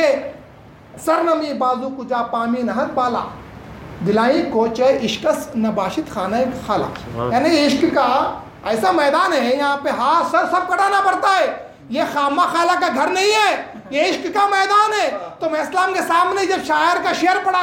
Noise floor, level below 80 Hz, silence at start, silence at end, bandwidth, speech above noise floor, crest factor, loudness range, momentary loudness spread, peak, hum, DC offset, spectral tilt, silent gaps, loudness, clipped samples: -42 dBFS; -52 dBFS; 0 s; 0 s; 16.5 kHz; 25 dB; 14 dB; 4 LU; 9 LU; -4 dBFS; none; under 0.1%; -4 dB/octave; none; -18 LUFS; under 0.1%